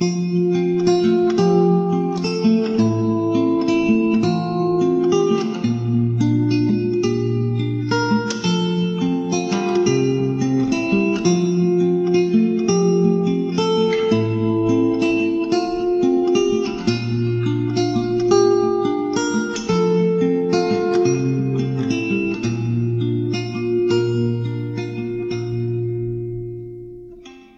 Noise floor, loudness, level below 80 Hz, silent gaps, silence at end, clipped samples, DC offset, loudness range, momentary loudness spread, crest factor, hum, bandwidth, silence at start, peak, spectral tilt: -41 dBFS; -19 LUFS; -52 dBFS; none; 0.2 s; under 0.1%; under 0.1%; 4 LU; 6 LU; 16 dB; none; 8 kHz; 0 s; -2 dBFS; -6.5 dB/octave